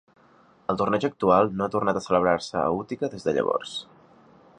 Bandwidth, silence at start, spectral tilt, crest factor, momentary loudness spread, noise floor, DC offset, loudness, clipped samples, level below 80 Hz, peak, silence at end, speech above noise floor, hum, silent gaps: 10.5 kHz; 0.7 s; -6 dB/octave; 20 dB; 10 LU; -57 dBFS; under 0.1%; -25 LUFS; under 0.1%; -56 dBFS; -6 dBFS; 0.75 s; 33 dB; none; none